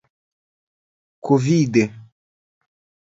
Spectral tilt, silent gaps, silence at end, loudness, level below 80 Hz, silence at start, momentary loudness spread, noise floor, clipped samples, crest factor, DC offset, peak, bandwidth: -7 dB/octave; none; 1.05 s; -19 LUFS; -62 dBFS; 1.25 s; 10 LU; under -90 dBFS; under 0.1%; 20 dB; under 0.1%; -2 dBFS; 7.8 kHz